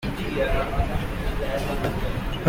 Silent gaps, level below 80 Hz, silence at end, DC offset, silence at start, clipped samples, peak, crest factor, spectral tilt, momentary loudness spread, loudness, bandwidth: none; -30 dBFS; 0 s; under 0.1%; 0 s; under 0.1%; -6 dBFS; 20 dB; -6.5 dB/octave; 4 LU; -27 LUFS; 16.5 kHz